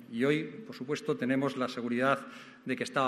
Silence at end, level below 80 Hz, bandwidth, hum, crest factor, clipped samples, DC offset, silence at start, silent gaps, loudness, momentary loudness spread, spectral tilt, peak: 0 s; -78 dBFS; 13.5 kHz; none; 20 dB; under 0.1%; under 0.1%; 0 s; none; -32 LUFS; 13 LU; -5.5 dB/octave; -12 dBFS